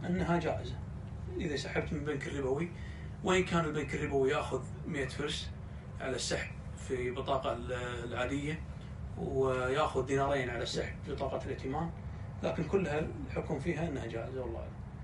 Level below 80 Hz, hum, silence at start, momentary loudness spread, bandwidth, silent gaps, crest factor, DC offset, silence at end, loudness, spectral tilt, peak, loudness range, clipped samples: -48 dBFS; none; 0 s; 12 LU; 11.5 kHz; none; 18 dB; under 0.1%; 0 s; -36 LUFS; -5.5 dB/octave; -18 dBFS; 3 LU; under 0.1%